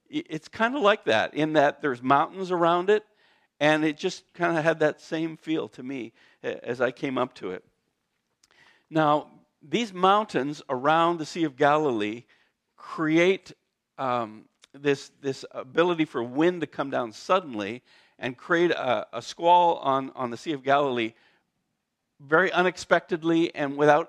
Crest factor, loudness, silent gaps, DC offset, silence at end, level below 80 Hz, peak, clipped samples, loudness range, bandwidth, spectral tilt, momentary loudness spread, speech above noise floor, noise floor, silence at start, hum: 20 dB; -25 LUFS; none; under 0.1%; 0 s; -74 dBFS; -6 dBFS; under 0.1%; 6 LU; 10.5 kHz; -5.5 dB/octave; 13 LU; 55 dB; -80 dBFS; 0.1 s; none